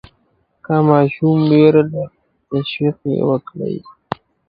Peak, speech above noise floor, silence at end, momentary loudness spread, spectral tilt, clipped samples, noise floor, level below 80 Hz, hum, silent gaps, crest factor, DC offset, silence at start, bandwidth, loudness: 0 dBFS; 47 dB; 0.6 s; 18 LU; -11 dB/octave; under 0.1%; -62 dBFS; -56 dBFS; none; none; 16 dB; under 0.1%; 0.7 s; 5.2 kHz; -16 LUFS